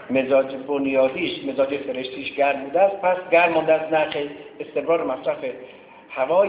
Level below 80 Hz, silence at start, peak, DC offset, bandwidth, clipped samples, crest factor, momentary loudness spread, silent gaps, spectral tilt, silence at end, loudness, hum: -62 dBFS; 0 s; -4 dBFS; under 0.1%; 4 kHz; under 0.1%; 18 dB; 12 LU; none; -8.5 dB/octave; 0 s; -22 LUFS; none